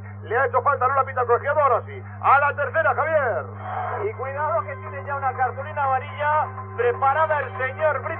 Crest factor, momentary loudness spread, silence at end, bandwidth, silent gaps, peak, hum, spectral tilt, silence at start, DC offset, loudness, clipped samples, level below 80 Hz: 18 dB; 9 LU; 0 s; 4 kHz; none; -6 dBFS; none; -4.5 dB/octave; 0 s; under 0.1%; -22 LUFS; under 0.1%; -66 dBFS